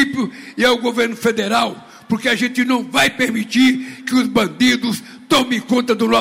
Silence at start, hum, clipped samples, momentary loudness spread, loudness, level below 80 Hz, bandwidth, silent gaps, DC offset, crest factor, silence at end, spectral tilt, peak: 0 s; none; under 0.1%; 9 LU; -17 LUFS; -54 dBFS; 16 kHz; none; 0.1%; 12 dB; 0 s; -3.5 dB/octave; -4 dBFS